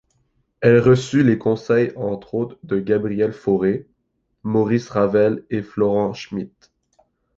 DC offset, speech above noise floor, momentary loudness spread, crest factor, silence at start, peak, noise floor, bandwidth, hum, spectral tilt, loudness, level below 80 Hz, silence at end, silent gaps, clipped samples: under 0.1%; 52 dB; 12 LU; 18 dB; 0.6 s; -2 dBFS; -71 dBFS; 8 kHz; none; -7.5 dB/octave; -19 LUFS; -54 dBFS; 0.9 s; none; under 0.1%